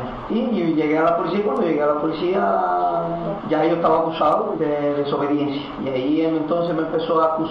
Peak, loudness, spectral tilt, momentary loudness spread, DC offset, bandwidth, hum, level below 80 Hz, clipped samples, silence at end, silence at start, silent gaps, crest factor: -6 dBFS; -20 LUFS; -8.5 dB/octave; 5 LU; under 0.1%; 6 kHz; none; -52 dBFS; under 0.1%; 0 s; 0 s; none; 14 dB